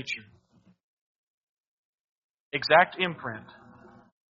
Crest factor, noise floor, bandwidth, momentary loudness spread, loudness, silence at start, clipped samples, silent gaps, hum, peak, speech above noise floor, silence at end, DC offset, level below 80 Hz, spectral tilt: 26 dB; -53 dBFS; 7.2 kHz; 17 LU; -25 LUFS; 0 s; under 0.1%; 0.83-2.51 s; none; -6 dBFS; 27 dB; 0.9 s; under 0.1%; -72 dBFS; -1.5 dB/octave